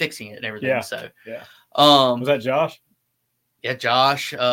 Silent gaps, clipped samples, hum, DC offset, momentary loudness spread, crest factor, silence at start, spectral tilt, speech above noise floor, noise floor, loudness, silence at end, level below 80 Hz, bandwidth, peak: none; under 0.1%; none; under 0.1%; 21 LU; 20 dB; 0 s; -4 dB/octave; 53 dB; -73 dBFS; -19 LUFS; 0 s; -68 dBFS; 17 kHz; 0 dBFS